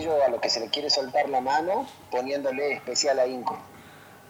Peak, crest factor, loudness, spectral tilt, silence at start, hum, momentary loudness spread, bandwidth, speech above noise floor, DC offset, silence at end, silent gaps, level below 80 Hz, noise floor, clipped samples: -8 dBFS; 18 dB; -26 LUFS; -2 dB/octave; 0 s; none; 8 LU; 17 kHz; 23 dB; under 0.1%; 0.1 s; none; -66 dBFS; -49 dBFS; under 0.1%